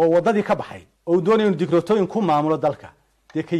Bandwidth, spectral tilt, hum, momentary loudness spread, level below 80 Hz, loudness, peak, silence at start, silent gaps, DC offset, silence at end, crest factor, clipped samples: 11 kHz; -7.5 dB/octave; none; 13 LU; -58 dBFS; -20 LUFS; -8 dBFS; 0 s; none; under 0.1%; 0 s; 12 dB; under 0.1%